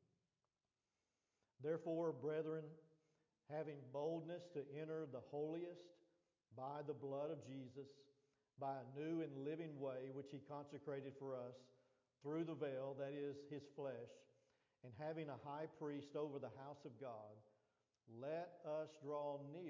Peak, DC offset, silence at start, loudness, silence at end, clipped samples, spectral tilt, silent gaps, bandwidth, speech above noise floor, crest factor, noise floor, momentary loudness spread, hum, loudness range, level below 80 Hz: -34 dBFS; under 0.1%; 1.6 s; -50 LUFS; 0 s; under 0.1%; -6.5 dB/octave; none; 7.2 kHz; over 40 dB; 18 dB; under -90 dBFS; 11 LU; none; 3 LU; under -90 dBFS